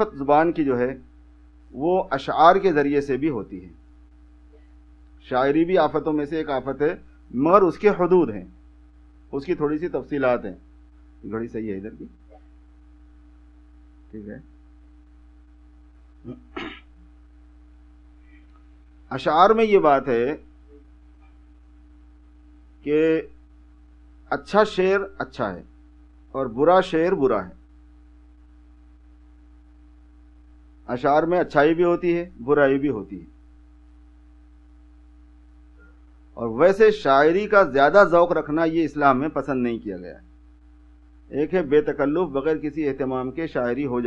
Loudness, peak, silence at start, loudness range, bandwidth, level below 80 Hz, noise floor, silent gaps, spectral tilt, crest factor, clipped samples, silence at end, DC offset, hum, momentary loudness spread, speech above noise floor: -21 LUFS; 0 dBFS; 0 s; 18 LU; 8.4 kHz; -50 dBFS; -50 dBFS; none; -7.5 dB/octave; 24 dB; under 0.1%; 0 s; under 0.1%; none; 21 LU; 29 dB